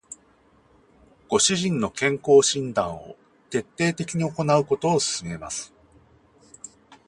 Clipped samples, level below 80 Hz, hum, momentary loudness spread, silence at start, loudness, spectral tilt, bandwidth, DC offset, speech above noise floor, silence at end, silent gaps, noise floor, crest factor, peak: under 0.1%; -58 dBFS; none; 25 LU; 0.1 s; -23 LUFS; -4 dB/octave; 11.5 kHz; under 0.1%; 36 dB; 1.4 s; none; -59 dBFS; 20 dB; -6 dBFS